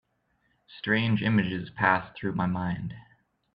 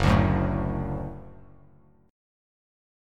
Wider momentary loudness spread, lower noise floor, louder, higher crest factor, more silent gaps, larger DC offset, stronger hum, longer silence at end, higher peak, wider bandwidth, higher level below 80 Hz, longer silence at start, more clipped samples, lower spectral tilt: second, 12 LU vs 17 LU; first, -72 dBFS vs -57 dBFS; about the same, -27 LUFS vs -26 LUFS; about the same, 24 dB vs 22 dB; neither; neither; neither; second, 0.55 s vs 1.75 s; about the same, -6 dBFS vs -6 dBFS; second, 5.2 kHz vs 11 kHz; second, -60 dBFS vs -38 dBFS; first, 0.7 s vs 0 s; neither; first, -9 dB/octave vs -7.5 dB/octave